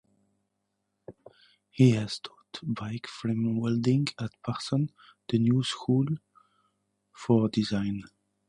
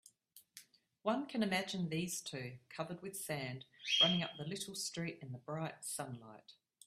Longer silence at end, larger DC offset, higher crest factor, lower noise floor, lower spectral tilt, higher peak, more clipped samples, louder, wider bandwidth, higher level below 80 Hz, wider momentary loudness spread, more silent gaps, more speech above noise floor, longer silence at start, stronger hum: about the same, 0.45 s vs 0.35 s; neither; about the same, 20 dB vs 24 dB; first, -80 dBFS vs -67 dBFS; first, -7 dB/octave vs -3.5 dB/octave; first, -10 dBFS vs -18 dBFS; neither; first, -28 LUFS vs -39 LUFS; second, 11 kHz vs 15.5 kHz; first, -62 dBFS vs -78 dBFS; second, 14 LU vs 21 LU; neither; first, 53 dB vs 27 dB; first, 1.1 s vs 0.35 s; neither